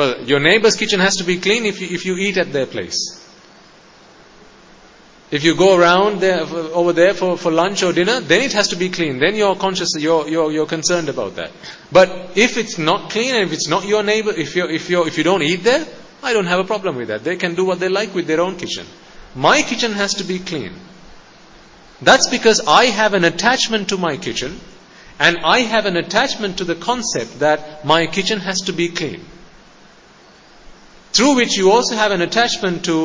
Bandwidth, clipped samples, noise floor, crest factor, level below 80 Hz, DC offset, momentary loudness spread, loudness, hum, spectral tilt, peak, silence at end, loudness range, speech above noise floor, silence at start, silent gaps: 7.8 kHz; under 0.1%; -46 dBFS; 18 dB; -52 dBFS; under 0.1%; 10 LU; -16 LUFS; none; -3.5 dB/octave; 0 dBFS; 0 s; 5 LU; 29 dB; 0 s; none